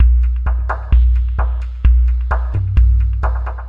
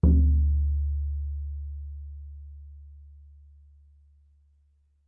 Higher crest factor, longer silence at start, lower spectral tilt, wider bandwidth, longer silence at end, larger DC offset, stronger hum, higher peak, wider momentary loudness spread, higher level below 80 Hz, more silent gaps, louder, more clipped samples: second, 12 dB vs 18 dB; about the same, 0 s vs 0.05 s; second, -9 dB/octave vs -14.5 dB/octave; first, 3 kHz vs 1.3 kHz; second, 0 s vs 1.95 s; neither; neither; first, -2 dBFS vs -10 dBFS; second, 6 LU vs 26 LU; first, -14 dBFS vs -30 dBFS; neither; first, -17 LUFS vs -28 LUFS; neither